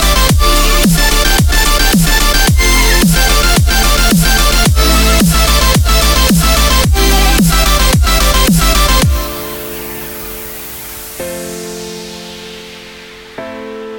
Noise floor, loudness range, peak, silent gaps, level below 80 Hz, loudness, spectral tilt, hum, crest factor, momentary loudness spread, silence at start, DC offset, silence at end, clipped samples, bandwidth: -32 dBFS; 14 LU; 0 dBFS; none; -14 dBFS; -9 LUFS; -3.5 dB/octave; none; 10 dB; 16 LU; 0 s; under 0.1%; 0 s; under 0.1%; over 20 kHz